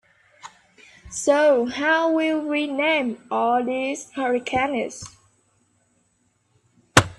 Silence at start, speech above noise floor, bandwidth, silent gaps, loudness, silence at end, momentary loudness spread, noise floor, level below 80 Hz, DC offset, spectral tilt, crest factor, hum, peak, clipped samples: 0.45 s; 45 dB; 14 kHz; none; -22 LUFS; 0.05 s; 10 LU; -67 dBFS; -54 dBFS; under 0.1%; -4 dB/octave; 24 dB; none; 0 dBFS; under 0.1%